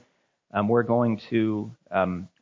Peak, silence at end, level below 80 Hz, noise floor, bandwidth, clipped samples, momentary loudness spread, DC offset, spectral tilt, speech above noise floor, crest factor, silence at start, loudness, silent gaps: -8 dBFS; 0.15 s; -56 dBFS; -67 dBFS; 7 kHz; under 0.1%; 8 LU; under 0.1%; -9 dB/octave; 42 dB; 18 dB; 0.55 s; -26 LUFS; none